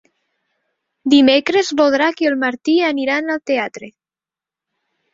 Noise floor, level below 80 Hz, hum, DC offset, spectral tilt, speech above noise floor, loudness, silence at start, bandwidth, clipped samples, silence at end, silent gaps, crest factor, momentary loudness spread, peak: under -90 dBFS; -62 dBFS; none; under 0.1%; -3 dB/octave; over 75 dB; -16 LUFS; 1.05 s; 7.8 kHz; under 0.1%; 1.25 s; none; 18 dB; 9 LU; 0 dBFS